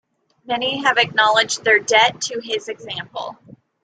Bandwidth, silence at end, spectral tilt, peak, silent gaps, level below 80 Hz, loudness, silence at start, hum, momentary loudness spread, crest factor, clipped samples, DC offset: 9.6 kHz; 0.5 s; -1.5 dB/octave; -2 dBFS; none; -66 dBFS; -17 LUFS; 0.5 s; none; 14 LU; 18 dB; under 0.1%; under 0.1%